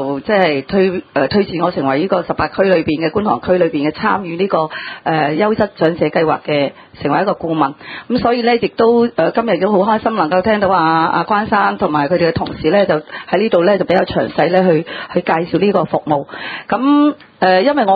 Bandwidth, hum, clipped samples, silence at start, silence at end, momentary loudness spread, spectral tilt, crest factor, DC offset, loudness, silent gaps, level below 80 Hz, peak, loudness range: 5 kHz; none; under 0.1%; 0 s; 0 s; 6 LU; -9 dB/octave; 14 dB; under 0.1%; -15 LUFS; none; -46 dBFS; 0 dBFS; 2 LU